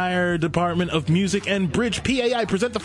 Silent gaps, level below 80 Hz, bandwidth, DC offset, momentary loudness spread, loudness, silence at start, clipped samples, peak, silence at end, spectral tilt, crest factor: none; -46 dBFS; 11.5 kHz; under 0.1%; 2 LU; -22 LUFS; 0 s; under 0.1%; -8 dBFS; 0 s; -5.5 dB/octave; 14 dB